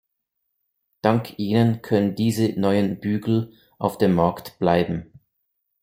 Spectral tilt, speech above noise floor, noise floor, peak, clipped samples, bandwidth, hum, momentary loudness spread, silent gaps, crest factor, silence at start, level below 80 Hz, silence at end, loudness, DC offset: -7.5 dB/octave; 57 dB; -78 dBFS; -4 dBFS; under 0.1%; 16.5 kHz; none; 7 LU; none; 20 dB; 1.05 s; -56 dBFS; 0.8 s; -22 LUFS; under 0.1%